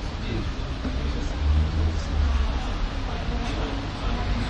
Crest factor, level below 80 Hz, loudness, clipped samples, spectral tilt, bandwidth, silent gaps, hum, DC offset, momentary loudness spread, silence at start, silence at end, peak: 12 dB; -28 dBFS; -28 LUFS; under 0.1%; -6.5 dB/octave; 8.4 kHz; none; none; under 0.1%; 6 LU; 0 s; 0 s; -12 dBFS